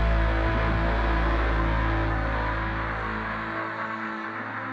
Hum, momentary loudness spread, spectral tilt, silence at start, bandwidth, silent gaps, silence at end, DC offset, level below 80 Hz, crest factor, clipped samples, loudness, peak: none; 6 LU; -7.5 dB/octave; 0 s; 5.8 kHz; none; 0 s; under 0.1%; -28 dBFS; 14 dB; under 0.1%; -27 LUFS; -12 dBFS